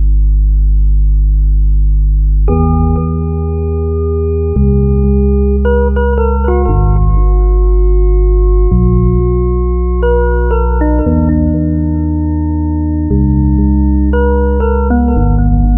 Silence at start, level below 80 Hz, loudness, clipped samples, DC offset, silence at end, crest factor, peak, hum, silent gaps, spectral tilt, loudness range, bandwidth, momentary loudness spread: 0 s; -10 dBFS; -12 LUFS; under 0.1%; under 0.1%; 0 s; 10 dB; 0 dBFS; none; none; -14 dB/octave; 1 LU; 3 kHz; 3 LU